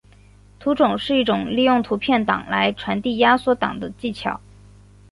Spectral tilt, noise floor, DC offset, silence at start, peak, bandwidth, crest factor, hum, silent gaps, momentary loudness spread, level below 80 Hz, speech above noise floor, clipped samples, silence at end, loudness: -6.5 dB/octave; -49 dBFS; under 0.1%; 0.6 s; -2 dBFS; 11.5 kHz; 18 dB; 50 Hz at -40 dBFS; none; 11 LU; -50 dBFS; 29 dB; under 0.1%; 0.75 s; -20 LUFS